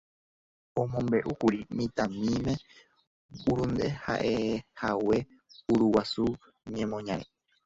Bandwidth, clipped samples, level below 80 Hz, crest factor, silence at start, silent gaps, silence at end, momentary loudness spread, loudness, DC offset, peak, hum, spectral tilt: 7.8 kHz; under 0.1%; -54 dBFS; 20 dB; 0.75 s; 3.07-3.29 s; 0.4 s; 10 LU; -30 LUFS; under 0.1%; -10 dBFS; none; -6.5 dB/octave